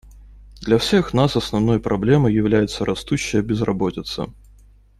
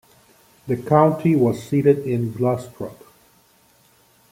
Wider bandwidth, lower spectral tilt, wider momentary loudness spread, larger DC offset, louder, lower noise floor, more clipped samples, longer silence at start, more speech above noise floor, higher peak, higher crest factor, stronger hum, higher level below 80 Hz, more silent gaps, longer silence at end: second, 13.5 kHz vs 16.5 kHz; second, -6 dB/octave vs -8.5 dB/octave; second, 11 LU vs 18 LU; neither; about the same, -19 LUFS vs -19 LUFS; second, -49 dBFS vs -57 dBFS; neither; second, 0.05 s vs 0.65 s; second, 30 dB vs 38 dB; about the same, -2 dBFS vs -2 dBFS; about the same, 18 dB vs 20 dB; neither; first, -40 dBFS vs -58 dBFS; neither; second, 0.65 s vs 1.4 s